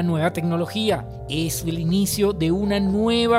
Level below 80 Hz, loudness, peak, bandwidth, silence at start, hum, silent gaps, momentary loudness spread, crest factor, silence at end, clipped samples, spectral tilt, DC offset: -42 dBFS; -22 LUFS; -8 dBFS; 16 kHz; 0 s; none; none; 5 LU; 14 dB; 0 s; under 0.1%; -5.5 dB/octave; under 0.1%